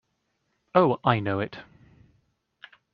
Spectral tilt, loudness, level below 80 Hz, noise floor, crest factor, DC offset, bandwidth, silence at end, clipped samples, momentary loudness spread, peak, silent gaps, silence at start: -5.5 dB/octave; -25 LUFS; -64 dBFS; -75 dBFS; 24 dB; under 0.1%; 5.6 kHz; 1.3 s; under 0.1%; 13 LU; -4 dBFS; none; 0.75 s